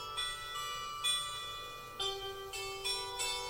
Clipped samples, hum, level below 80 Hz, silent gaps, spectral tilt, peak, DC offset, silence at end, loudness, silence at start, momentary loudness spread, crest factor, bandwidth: under 0.1%; none; -60 dBFS; none; 0 dB/octave; -20 dBFS; under 0.1%; 0 s; -37 LUFS; 0 s; 9 LU; 18 dB; 16.5 kHz